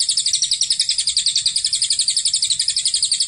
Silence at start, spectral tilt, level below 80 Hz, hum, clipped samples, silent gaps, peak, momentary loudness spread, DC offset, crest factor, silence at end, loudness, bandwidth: 0 s; 4 dB/octave; -56 dBFS; none; under 0.1%; none; -4 dBFS; 1 LU; under 0.1%; 14 dB; 0 s; -16 LUFS; 16 kHz